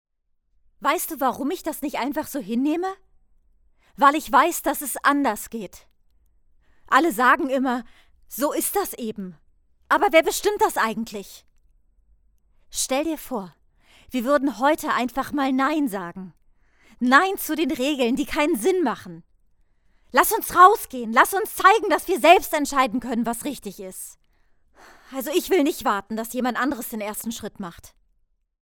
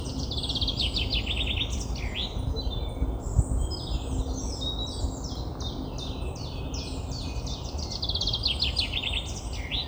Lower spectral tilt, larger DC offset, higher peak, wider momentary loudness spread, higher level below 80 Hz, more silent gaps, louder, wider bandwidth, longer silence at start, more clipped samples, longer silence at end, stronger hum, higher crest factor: about the same, -3 dB/octave vs -4 dB/octave; neither; first, 0 dBFS vs -8 dBFS; first, 17 LU vs 9 LU; second, -54 dBFS vs -34 dBFS; neither; first, -21 LUFS vs -30 LUFS; about the same, over 20 kHz vs over 20 kHz; first, 0.8 s vs 0 s; neither; first, 0.75 s vs 0 s; neither; about the same, 22 dB vs 22 dB